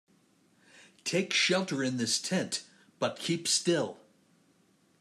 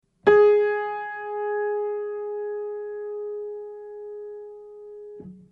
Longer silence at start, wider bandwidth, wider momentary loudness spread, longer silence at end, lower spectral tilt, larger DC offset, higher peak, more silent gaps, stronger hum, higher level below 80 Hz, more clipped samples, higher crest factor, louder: first, 0.75 s vs 0.25 s; first, 14 kHz vs 4.5 kHz; second, 10 LU vs 24 LU; first, 1.05 s vs 0.1 s; second, -3 dB/octave vs -6.5 dB/octave; neither; second, -14 dBFS vs -4 dBFS; neither; neither; second, -80 dBFS vs -64 dBFS; neither; about the same, 18 dB vs 22 dB; second, -30 LUFS vs -24 LUFS